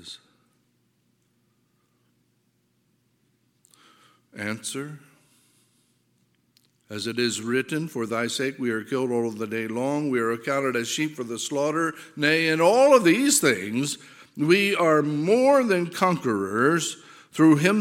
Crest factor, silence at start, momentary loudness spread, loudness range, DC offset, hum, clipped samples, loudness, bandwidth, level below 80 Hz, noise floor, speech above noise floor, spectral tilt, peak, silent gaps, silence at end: 22 dB; 0.05 s; 14 LU; 18 LU; under 0.1%; none; under 0.1%; -23 LUFS; 17 kHz; -76 dBFS; -69 dBFS; 46 dB; -4 dB/octave; -4 dBFS; none; 0 s